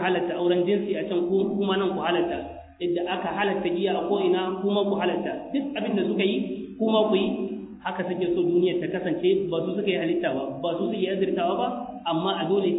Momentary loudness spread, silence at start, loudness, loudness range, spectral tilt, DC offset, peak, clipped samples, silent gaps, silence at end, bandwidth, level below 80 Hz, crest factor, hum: 6 LU; 0 s; -25 LUFS; 1 LU; -10 dB/octave; under 0.1%; -8 dBFS; under 0.1%; none; 0 s; 4 kHz; -60 dBFS; 16 dB; none